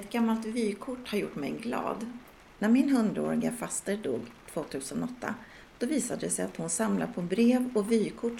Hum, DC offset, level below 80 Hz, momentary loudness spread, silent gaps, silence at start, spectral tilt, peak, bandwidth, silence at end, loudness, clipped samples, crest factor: none; under 0.1%; -62 dBFS; 13 LU; none; 0 s; -5 dB/octave; -14 dBFS; 16.5 kHz; 0 s; -30 LUFS; under 0.1%; 16 dB